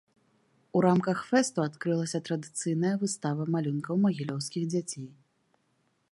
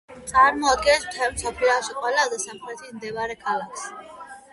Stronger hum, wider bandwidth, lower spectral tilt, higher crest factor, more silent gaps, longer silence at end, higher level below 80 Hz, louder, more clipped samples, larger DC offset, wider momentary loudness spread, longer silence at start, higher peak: neither; about the same, 11.5 kHz vs 11.5 kHz; first, -6 dB/octave vs -1.5 dB/octave; about the same, 20 dB vs 18 dB; neither; first, 1 s vs 0.1 s; second, -76 dBFS vs -50 dBFS; second, -29 LUFS vs -22 LUFS; neither; neither; second, 8 LU vs 19 LU; first, 0.75 s vs 0.1 s; second, -10 dBFS vs -6 dBFS